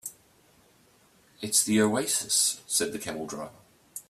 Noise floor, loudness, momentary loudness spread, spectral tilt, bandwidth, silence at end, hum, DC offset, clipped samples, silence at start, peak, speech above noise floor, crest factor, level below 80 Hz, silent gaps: -61 dBFS; -25 LUFS; 18 LU; -2 dB/octave; 16 kHz; 0.1 s; none; under 0.1%; under 0.1%; 0.05 s; -10 dBFS; 34 dB; 20 dB; -68 dBFS; none